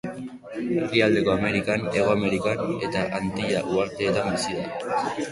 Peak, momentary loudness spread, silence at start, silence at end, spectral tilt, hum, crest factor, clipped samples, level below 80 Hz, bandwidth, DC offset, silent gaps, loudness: -4 dBFS; 8 LU; 0.05 s; 0 s; -5.5 dB/octave; none; 20 dB; under 0.1%; -52 dBFS; 11.5 kHz; under 0.1%; none; -24 LUFS